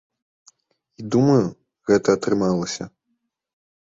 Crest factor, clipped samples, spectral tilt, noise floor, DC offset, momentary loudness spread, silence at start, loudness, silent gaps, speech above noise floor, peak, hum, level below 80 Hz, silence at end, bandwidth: 18 dB; under 0.1%; -6.5 dB/octave; -74 dBFS; under 0.1%; 15 LU; 1 s; -20 LUFS; none; 55 dB; -4 dBFS; none; -56 dBFS; 0.9 s; 7.8 kHz